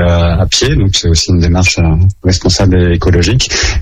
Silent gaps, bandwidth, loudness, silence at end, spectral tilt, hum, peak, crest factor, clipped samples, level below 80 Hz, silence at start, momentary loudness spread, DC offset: none; 10 kHz; -10 LUFS; 0 s; -4.5 dB/octave; none; 0 dBFS; 8 dB; under 0.1%; -18 dBFS; 0 s; 2 LU; under 0.1%